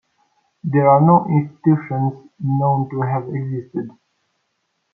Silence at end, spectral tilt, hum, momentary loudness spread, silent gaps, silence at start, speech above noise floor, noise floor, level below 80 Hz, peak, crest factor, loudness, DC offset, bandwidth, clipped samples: 1.05 s; -13 dB/octave; none; 15 LU; none; 0.65 s; 54 dB; -71 dBFS; -64 dBFS; -2 dBFS; 16 dB; -18 LUFS; under 0.1%; 2.7 kHz; under 0.1%